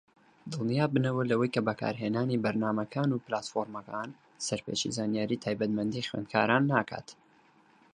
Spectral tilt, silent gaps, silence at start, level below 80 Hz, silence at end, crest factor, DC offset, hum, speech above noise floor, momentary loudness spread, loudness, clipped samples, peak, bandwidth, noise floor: -5.5 dB/octave; none; 0.45 s; -68 dBFS; 0.8 s; 22 dB; under 0.1%; none; 33 dB; 11 LU; -31 LUFS; under 0.1%; -8 dBFS; 10.5 kHz; -63 dBFS